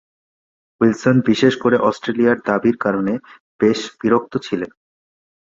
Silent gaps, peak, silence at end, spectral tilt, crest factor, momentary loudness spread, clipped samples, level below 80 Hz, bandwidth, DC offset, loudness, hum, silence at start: 3.40-3.59 s; -2 dBFS; 0.9 s; -6.5 dB/octave; 18 dB; 9 LU; under 0.1%; -56 dBFS; 7.6 kHz; under 0.1%; -18 LUFS; none; 0.8 s